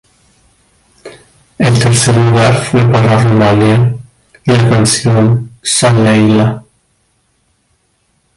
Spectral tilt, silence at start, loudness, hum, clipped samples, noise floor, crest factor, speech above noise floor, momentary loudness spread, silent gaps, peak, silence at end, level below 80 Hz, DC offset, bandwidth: -5.5 dB/octave; 1.05 s; -9 LUFS; none; under 0.1%; -58 dBFS; 10 dB; 50 dB; 7 LU; none; 0 dBFS; 1.75 s; -40 dBFS; under 0.1%; 11.5 kHz